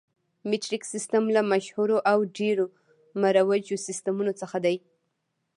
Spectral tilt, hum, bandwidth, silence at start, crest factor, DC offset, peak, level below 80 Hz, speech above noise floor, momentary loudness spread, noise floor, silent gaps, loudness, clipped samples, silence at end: -4.5 dB/octave; none; 11.5 kHz; 0.45 s; 18 dB; under 0.1%; -8 dBFS; -82 dBFS; 53 dB; 9 LU; -78 dBFS; none; -26 LUFS; under 0.1%; 0.8 s